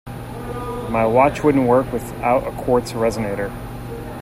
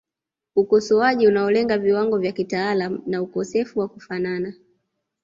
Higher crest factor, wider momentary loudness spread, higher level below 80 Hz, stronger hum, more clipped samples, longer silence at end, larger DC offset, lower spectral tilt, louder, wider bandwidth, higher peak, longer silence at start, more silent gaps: about the same, 18 dB vs 16 dB; first, 16 LU vs 10 LU; first, -38 dBFS vs -62 dBFS; neither; neither; second, 0 s vs 0.7 s; neither; about the same, -7 dB/octave vs -6 dB/octave; about the same, -19 LUFS vs -21 LUFS; first, 16 kHz vs 7.6 kHz; first, 0 dBFS vs -6 dBFS; second, 0.05 s vs 0.55 s; neither